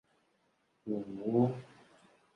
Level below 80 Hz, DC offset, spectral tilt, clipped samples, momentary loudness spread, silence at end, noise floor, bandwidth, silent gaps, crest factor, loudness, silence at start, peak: -76 dBFS; under 0.1%; -10 dB/octave; under 0.1%; 16 LU; 0.7 s; -75 dBFS; 6.6 kHz; none; 20 dB; -34 LUFS; 0.85 s; -16 dBFS